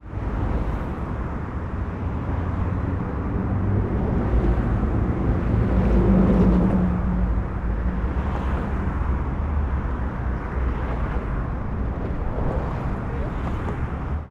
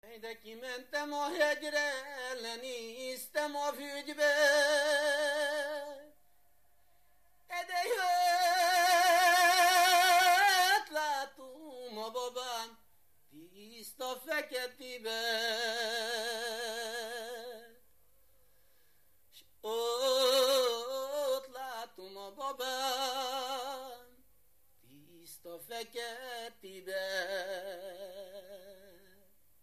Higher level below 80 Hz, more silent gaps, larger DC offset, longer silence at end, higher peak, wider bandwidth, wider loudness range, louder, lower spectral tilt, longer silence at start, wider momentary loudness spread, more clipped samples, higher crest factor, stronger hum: first, -26 dBFS vs -80 dBFS; neither; first, 0.2% vs under 0.1%; second, 0.05 s vs 0.9 s; first, -6 dBFS vs -16 dBFS; second, 4.5 kHz vs 15 kHz; second, 6 LU vs 15 LU; first, -25 LUFS vs -31 LUFS; first, -10 dB/octave vs 0.5 dB/octave; about the same, 0.05 s vs 0.05 s; second, 9 LU vs 22 LU; neither; about the same, 16 dB vs 18 dB; neither